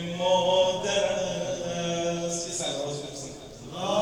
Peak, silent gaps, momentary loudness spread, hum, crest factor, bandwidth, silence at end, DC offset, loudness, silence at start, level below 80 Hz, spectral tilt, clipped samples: -10 dBFS; none; 15 LU; none; 16 dB; 12.5 kHz; 0 s; under 0.1%; -27 LUFS; 0 s; -56 dBFS; -3.5 dB/octave; under 0.1%